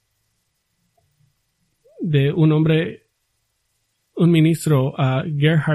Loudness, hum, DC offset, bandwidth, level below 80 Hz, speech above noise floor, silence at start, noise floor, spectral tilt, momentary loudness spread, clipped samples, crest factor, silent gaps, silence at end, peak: -18 LUFS; none; under 0.1%; 13 kHz; -56 dBFS; 54 dB; 2 s; -70 dBFS; -7.5 dB/octave; 8 LU; under 0.1%; 16 dB; none; 0 s; -4 dBFS